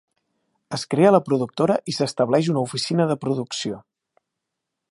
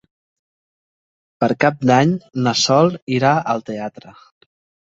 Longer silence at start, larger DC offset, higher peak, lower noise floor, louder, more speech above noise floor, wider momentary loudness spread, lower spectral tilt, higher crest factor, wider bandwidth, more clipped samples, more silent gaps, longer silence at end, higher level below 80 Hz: second, 0.7 s vs 1.4 s; neither; about the same, -2 dBFS vs -2 dBFS; second, -82 dBFS vs under -90 dBFS; second, -21 LUFS vs -17 LUFS; second, 61 dB vs over 73 dB; first, 14 LU vs 10 LU; about the same, -6 dB/octave vs -5 dB/octave; about the same, 20 dB vs 18 dB; first, 11.5 kHz vs 8 kHz; neither; second, none vs 3.02-3.07 s; first, 1.1 s vs 0.8 s; second, -66 dBFS vs -58 dBFS